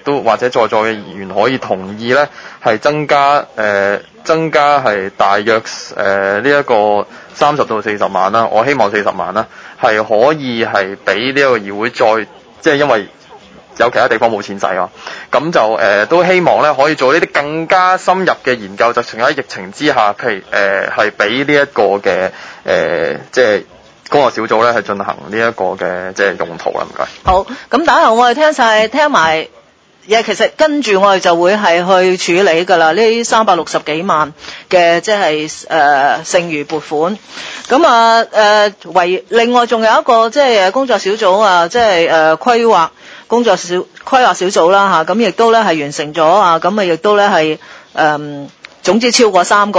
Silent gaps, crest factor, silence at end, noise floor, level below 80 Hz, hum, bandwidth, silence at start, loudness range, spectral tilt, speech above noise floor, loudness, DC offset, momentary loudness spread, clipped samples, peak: none; 12 dB; 0 s; -38 dBFS; -46 dBFS; none; 8 kHz; 0.05 s; 4 LU; -4 dB/octave; 26 dB; -12 LUFS; under 0.1%; 9 LU; 0.1%; 0 dBFS